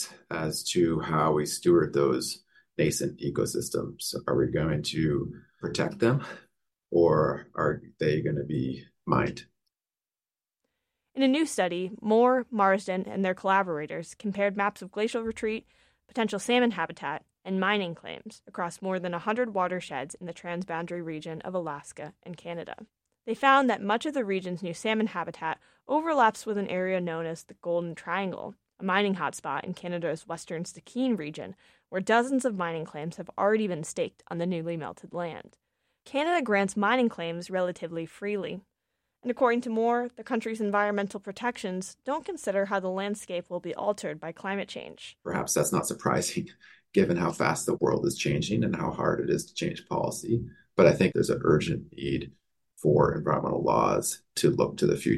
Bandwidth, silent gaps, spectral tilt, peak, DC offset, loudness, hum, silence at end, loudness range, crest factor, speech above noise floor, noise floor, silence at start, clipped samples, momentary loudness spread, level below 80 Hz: 13 kHz; none; -5 dB/octave; -8 dBFS; under 0.1%; -28 LUFS; none; 0 s; 5 LU; 22 dB; over 62 dB; under -90 dBFS; 0 s; under 0.1%; 13 LU; -58 dBFS